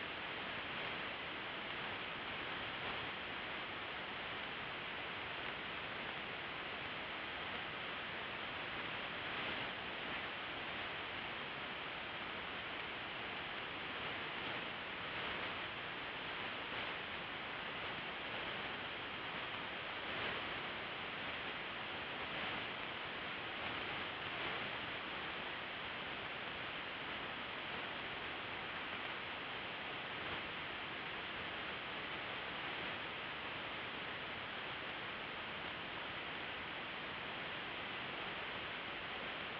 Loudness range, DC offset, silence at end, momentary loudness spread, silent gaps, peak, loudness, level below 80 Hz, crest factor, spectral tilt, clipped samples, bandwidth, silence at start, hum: 1 LU; under 0.1%; 0 s; 2 LU; none; -28 dBFS; -43 LUFS; -70 dBFS; 16 dB; -0.5 dB/octave; under 0.1%; 6 kHz; 0 s; none